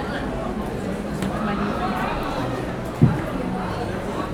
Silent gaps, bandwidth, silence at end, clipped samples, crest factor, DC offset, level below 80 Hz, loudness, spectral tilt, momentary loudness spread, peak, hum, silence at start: none; 17.5 kHz; 0 s; under 0.1%; 22 dB; under 0.1%; -38 dBFS; -25 LUFS; -7 dB/octave; 8 LU; -2 dBFS; none; 0 s